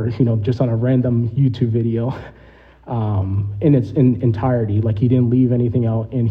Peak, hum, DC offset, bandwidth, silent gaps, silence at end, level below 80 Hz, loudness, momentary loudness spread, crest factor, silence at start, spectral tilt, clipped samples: -4 dBFS; none; under 0.1%; 5.2 kHz; none; 0 s; -44 dBFS; -18 LUFS; 6 LU; 14 dB; 0 s; -11 dB/octave; under 0.1%